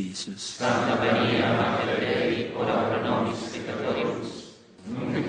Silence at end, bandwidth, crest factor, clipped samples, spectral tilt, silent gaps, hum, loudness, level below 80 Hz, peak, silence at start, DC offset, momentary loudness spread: 0 s; 10 kHz; 16 dB; under 0.1%; -5 dB/octave; none; none; -26 LUFS; -60 dBFS; -10 dBFS; 0 s; under 0.1%; 11 LU